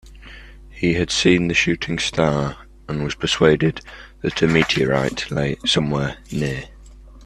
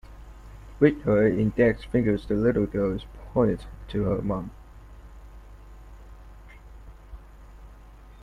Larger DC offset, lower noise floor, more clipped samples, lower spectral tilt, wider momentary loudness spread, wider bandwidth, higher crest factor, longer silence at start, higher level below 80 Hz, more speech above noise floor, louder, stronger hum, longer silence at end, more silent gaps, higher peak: neither; second, -42 dBFS vs -47 dBFS; neither; second, -5 dB/octave vs -9 dB/octave; second, 12 LU vs 23 LU; first, 12.5 kHz vs 10.5 kHz; about the same, 20 dB vs 22 dB; about the same, 0.05 s vs 0.1 s; about the same, -40 dBFS vs -44 dBFS; about the same, 22 dB vs 23 dB; first, -20 LUFS vs -25 LUFS; second, none vs 50 Hz at -45 dBFS; about the same, 0 s vs 0.1 s; neither; first, 0 dBFS vs -4 dBFS